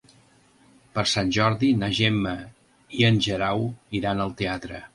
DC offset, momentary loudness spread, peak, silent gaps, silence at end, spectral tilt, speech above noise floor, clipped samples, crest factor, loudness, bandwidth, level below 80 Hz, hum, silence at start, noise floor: under 0.1%; 10 LU; -6 dBFS; none; 0.1 s; -5.5 dB/octave; 34 dB; under 0.1%; 18 dB; -24 LUFS; 11.5 kHz; -50 dBFS; none; 0.95 s; -58 dBFS